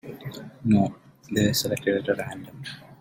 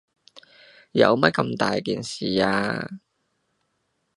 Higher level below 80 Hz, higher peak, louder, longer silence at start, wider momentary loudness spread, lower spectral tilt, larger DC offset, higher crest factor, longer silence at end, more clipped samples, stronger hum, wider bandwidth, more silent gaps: about the same, -56 dBFS vs -60 dBFS; second, -8 dBFS vs 0 dBFS; second, -25 LUFS vs -22 LUFS; second, 0.05 s vs 0.35 s; first, 16 LU vs 12 LU; about the same, -5 dB/octave vs -5.5 dB/octave; neither; second, 18 dB vs 24 dB; second, 0.05 s vs 1.2 s; neither; neither; first, 16.5 kHz vs 11.5 kHz; neither